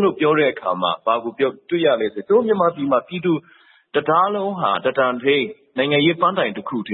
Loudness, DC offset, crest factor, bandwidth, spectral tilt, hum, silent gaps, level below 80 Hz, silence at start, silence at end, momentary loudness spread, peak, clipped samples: -19 LUFS; under 0.1%; 16 dB; 4.1 kHz; -10.5 dB/octave; none; none; -66 dBFS; 0 s; 0 s; 6 LU; -4 dBFS; under 0.1%